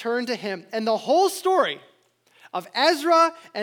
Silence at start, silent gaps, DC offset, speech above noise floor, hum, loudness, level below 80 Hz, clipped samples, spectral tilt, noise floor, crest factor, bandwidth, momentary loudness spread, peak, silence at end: 0 s; none; under 0.1%; 39 dB; none; -22 LUFS; -86 dBFS; under 0.1%; -3 dB/octave; -61 dBFS; 16 dB; over 20 kHz; 12 LU; -6 dBFS; 0 s